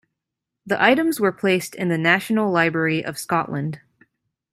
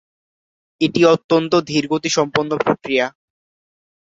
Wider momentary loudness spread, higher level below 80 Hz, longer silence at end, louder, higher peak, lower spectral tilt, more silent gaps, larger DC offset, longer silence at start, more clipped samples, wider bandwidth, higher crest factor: first, 10 LU vs 6 LU; about the same, -64 dBFS vs -60 dBFS; second, 0.75 s vs 1.05 s; second, -20 LUFS vs -17 LUFS; about the same, -2 dBFS vs -2 dBFS; about the same, -5 dB/octave vs -4.5 dB/octave; second, none vs 1.24-1.29 s; neither; second, 0.65 s vs 0.8 s; neither; first, 16 kHz vs 7.8 kHz; about the same, 20 dB vs 18 dB